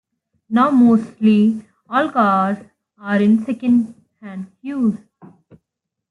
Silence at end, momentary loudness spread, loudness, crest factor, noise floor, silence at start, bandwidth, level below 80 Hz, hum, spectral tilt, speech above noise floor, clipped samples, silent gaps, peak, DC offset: 1.15 s; 18 LU; -17 LUFS; 14 dB; -80 dBFS; 0.5 s; 4.7 kHz; -64 dBFS; none; -8 dB/octave; 64 dB; under 0.1%; none; -4 dBFS; under 0.1%